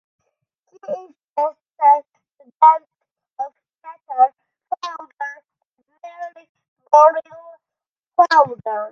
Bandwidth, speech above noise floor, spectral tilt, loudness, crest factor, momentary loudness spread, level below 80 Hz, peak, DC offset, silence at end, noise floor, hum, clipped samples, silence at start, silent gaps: 7.4 kHz; 73 dB; -3.5 dB/octave; -17 LUFS; 20 dB; 18 LU; -78 dBFS; 0 dBFS; under 0.1%; 0.05 s; -89 dBFS; none; under 0.1%; 0.9 s; 1.30-1.34 s, 3.11-3.15 s, 6.49-6.55 s, 6.68-6.76 s, 7.88-7.95 s, 8.08-8.12 s